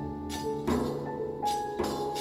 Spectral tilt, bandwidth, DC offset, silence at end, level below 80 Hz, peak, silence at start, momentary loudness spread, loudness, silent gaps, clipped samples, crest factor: -5.5 dB/octave; 16 kHz; under 0.1%; 0 s; -50 dBFS; -16 dBFS; 0 s; 5 LU; -32 LUFS; none; under 0.1%; 16 dB